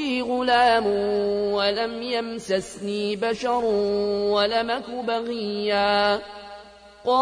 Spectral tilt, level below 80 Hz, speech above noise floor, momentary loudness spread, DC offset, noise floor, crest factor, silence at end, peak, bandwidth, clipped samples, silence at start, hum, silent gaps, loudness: -4.5 dB/octave; -56 dBFS; 23 dB; 9 LU; under 0.1%; -46 dBFS; 16 dB; 0 s; -8 dBFS; 10.5 kHz; under 0.1%; 0 s; none; none; -23 LUFS